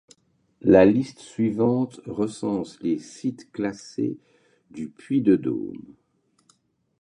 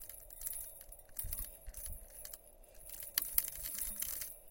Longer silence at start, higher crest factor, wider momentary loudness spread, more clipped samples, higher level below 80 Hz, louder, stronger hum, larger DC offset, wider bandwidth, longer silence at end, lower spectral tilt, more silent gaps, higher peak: first, 0.65 s vs 0 s; second, 22 dB vs 34 dB; first, 19 LU vs 16 LU; neither; about the same, -56 dBFS vs -54 dBFS; first, -24 LUFS vs -40 LUFS; neither; neither; second, 10.5 kHz vs 17 kHz; first, 1.2 s vs 0 s; first, -7.5 dB/octave vs -0.5 dB/octave; neither; first, -2 dBFS vs -10 dBFS